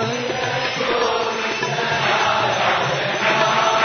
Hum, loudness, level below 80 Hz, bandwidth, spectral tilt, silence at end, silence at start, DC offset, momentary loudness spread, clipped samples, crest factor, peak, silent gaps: none; -19 LUFS; -56 dBFS; 6.6 kHz; -3 dB/octave; 0 s; 0 s; under 0.1%; 5 LU; under 0.1%; 16 dB; -4 dBFS; none